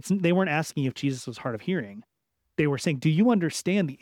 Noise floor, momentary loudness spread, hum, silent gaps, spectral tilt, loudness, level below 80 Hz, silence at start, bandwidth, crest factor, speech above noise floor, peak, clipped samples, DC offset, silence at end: -79 dBFS; 11 LU; none; none; -6 dB/octave; -26 LUFS; -66 dBFS; 0.05 s; 16 kHz; 16 dB; 54 dB; -10 dBFS; under 0.1%; under 0.1%; 0.05 s